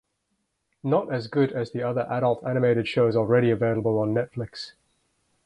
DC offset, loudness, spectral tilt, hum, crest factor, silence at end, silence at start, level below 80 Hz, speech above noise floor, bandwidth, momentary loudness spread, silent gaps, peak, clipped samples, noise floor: under 0.1%; -24 LUFS; -8 dB/octave; none; 18 dB; 0.75 s; 0.85 s; -60 dBFS; 52 dB; 9.6 kHz; 13 LU; none; -8 dBFS; under 0.1%; -76 dBFS